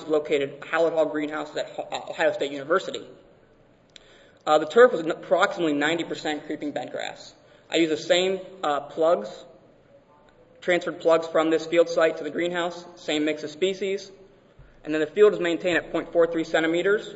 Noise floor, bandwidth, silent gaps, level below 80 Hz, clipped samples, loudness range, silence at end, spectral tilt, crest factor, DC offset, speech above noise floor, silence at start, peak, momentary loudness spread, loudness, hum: -57 dBFS; 8 kHz; none; -62 dBFS; under 0.1%; 4 LU; 0 s; -4.5 dB/octave; 20 dB; under 0.1%; 33 dB; 0 s; -4 dBFS; 13 LU; -24 LUFS; none